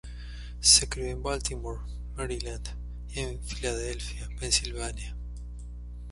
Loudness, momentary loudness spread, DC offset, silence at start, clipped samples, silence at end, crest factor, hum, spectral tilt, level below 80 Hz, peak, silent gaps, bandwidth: -28 LUFS; 22 LU; under 0.1%; 0.05 s; under 0.1%; 0 s; 26 dB; 60 Hz at -35 dBFS; -2 dB/octave; -38 dBFS; -6 dBFS; none; 11.5 kHz